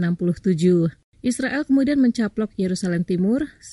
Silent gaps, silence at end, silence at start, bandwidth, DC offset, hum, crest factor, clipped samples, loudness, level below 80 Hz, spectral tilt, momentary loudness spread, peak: 1.04-1.12 s; 0 s; 0 s; 11.5 kHz; under 0.1%; none; 14 dB; under 0.1%; -21 LUFS; -52 dBFS; -7 dB/octave; 7 LU; -6 dBFS